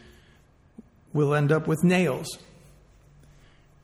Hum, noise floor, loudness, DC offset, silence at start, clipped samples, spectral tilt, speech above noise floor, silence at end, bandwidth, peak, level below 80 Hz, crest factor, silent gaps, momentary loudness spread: none; -58 dBFS; -24 LUFS; under 0.1%; 1.15 s; under 0.1%; -6.5 dB/octave; 35 dB; 1.45 s; 14.5 kHz; -10 dBFS; -58 dBFS; 18 dB; none; 14 LU